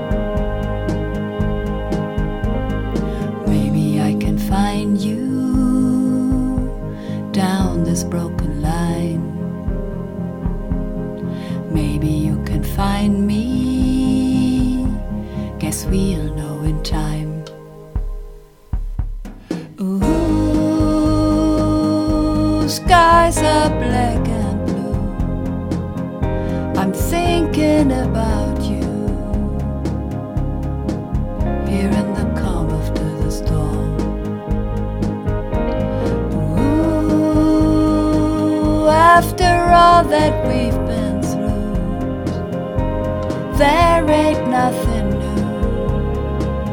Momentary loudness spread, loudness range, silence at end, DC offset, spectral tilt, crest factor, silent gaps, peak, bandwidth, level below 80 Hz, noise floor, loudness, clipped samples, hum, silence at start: 10 LU; 8 LU; 0 s; under 0.1%; -6.5 dB/octave; 16 dB; none; 0 dBFS; 18.5 kHz; -26 dBFS; -37 dBFS; -18 LUFS; under 0.1%; none; 0 s